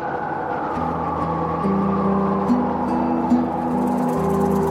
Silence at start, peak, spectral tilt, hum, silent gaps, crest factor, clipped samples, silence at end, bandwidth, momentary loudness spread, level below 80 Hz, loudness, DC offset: 0 s; -6 dBFS; -8.5 dB/octave; none; none; 14 dB; under 0.1%; 0 s; 15 kHz; 5 LU; -44 dBFS; -21 LUFS; under 0.1%